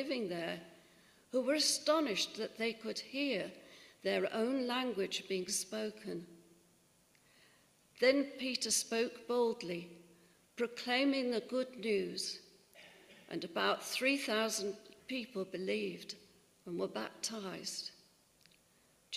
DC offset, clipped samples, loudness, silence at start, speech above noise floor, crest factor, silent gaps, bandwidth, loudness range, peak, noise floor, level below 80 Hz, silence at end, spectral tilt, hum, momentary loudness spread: under 0.1%; under 0.1%; -37 LUFS; 0 s; 33 dB; 22 dB; none; 15.5 kHz; 6 LU; -18 dBFS; -70 dBFS; -82 dBFS; 0 s; -2.5 dB/octave; none; 15 LU